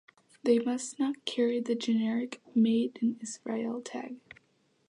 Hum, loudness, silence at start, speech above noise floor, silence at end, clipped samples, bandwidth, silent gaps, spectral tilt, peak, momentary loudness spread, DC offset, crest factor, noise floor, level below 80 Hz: none; -31 LUFS; 0.45 s; 41 dB; 0.7 s; under 0.1%; 11 kHz; none; -5 dB/octave; -14 dBFS; 12 LU; under 0.1%; 18 dB; -71 dBFS; -82 dBFS